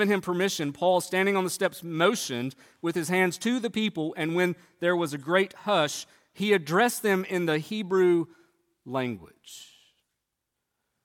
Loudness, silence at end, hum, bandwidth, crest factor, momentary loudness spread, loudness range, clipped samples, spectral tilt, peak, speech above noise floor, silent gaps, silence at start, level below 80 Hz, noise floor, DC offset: -27 LUFS; 1.4 s; none; 17.5 kHz; 20 dB; 11 LU; 4 LU; under 0.1%; -4.5 dB/octave; -8 dBFS; 56 dB; none; 0 s; -74 dBFS; -83 dBFS; under 0.1%